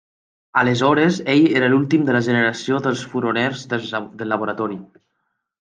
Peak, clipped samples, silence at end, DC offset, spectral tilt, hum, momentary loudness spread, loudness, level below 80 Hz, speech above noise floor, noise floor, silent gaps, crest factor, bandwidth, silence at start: -2 dBFS; under 0.1%; 0.75 s; under 0.1%; -6 dB/octave; none; 10 LU; -19 LUFS; -62 dBFS; 55 dB; -74 dBFS; none; 16 dB; 9.4 kHz; 0.55 s